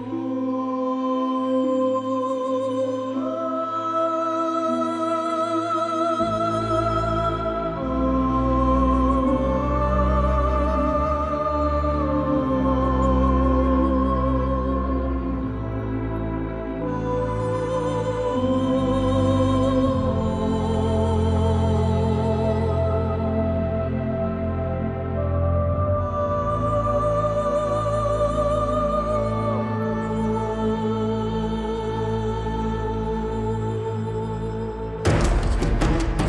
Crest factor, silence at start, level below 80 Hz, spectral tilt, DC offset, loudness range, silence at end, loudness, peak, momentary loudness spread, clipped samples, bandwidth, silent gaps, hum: 16 dB; 0 s; -30 dBFS; -8 dB/octave; under 0.1%; 4 LU; 0 s; -23 LUFS; -6 dBFS; 6 LU; under 0.1%; 11 kHz; none; none